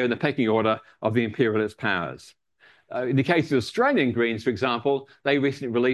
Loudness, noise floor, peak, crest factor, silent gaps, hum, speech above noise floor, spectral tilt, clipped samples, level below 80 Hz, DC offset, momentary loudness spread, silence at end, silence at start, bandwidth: -24 LUFS; -58 dBFS; -6 dBFS; 18 dB; none; none; 35 dB; -6.5 dB/octave; under 0.1%; -58 dBFS; under 0.1%; 6 LU; 0 s; 0 s; 12 kHz